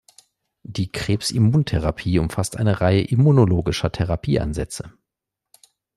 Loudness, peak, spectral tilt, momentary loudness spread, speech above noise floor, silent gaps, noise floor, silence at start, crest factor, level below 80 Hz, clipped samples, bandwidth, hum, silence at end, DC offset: -20 LUFS; -4 dBFS; -6.5 dB/octave; 12 LU; 65 dB; none; -84 dBFS; 0.7 s; 16 dB; -40 dBFS; under 0.1%; 13.5 kHz; none; 1.1 s; under 0.1%